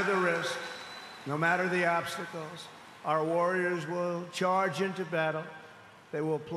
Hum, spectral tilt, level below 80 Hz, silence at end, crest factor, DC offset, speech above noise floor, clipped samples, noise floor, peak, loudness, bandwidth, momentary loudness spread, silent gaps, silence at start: none; -5 dB/octave; -78 dBFS; 0 s; 18 dB; under 0.1%; 22 dB; under 0.1%; -53 dBFS; -14 dBFS; -31 LUFS; 13 kHz; 15 LU; none; 0 s